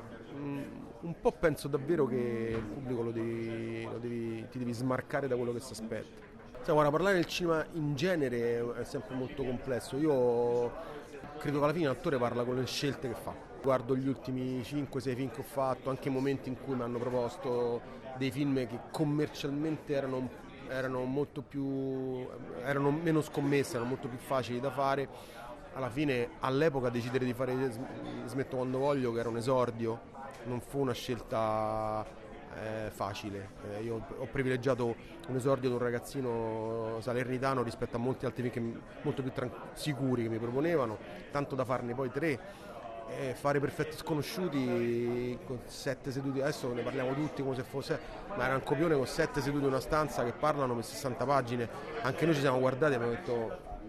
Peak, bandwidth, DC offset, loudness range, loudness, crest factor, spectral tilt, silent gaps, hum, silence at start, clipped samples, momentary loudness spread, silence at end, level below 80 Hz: -14 dBFS; 13.5 kHz; under 0.1%; 4 LU; -34 LUFS; 20 dB; -6.5 dB/octave; none; none; 0 s; under 0.1%; 10 LU; 0 s; -56 dBFS